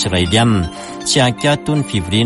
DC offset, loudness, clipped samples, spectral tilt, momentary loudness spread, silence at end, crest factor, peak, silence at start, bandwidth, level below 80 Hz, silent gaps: under 0.1%; -15 LUFS; under 0.1%; -4.5 dB/octave; 7 LU; 0 s; 14 dB; -2 dBFS; 0 s; 11.5 kHz; -36 dBFS; none